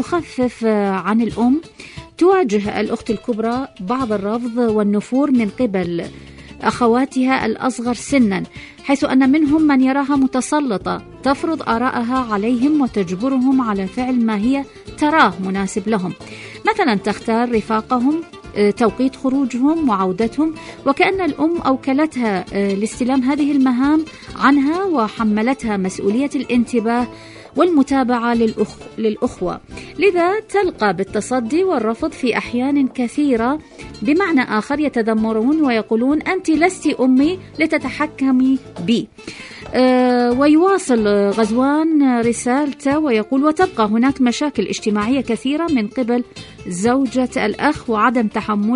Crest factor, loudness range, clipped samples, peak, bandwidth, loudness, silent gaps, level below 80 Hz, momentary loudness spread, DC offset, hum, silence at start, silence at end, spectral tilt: 16 dB; 3 LU; under 0.1%; 0 dBFS; 11 kHz; -17 LUFS; none; -46 dBFS; 7 LU; under 0.1%; none; 0 s; 0 s; -5.5 dB/octave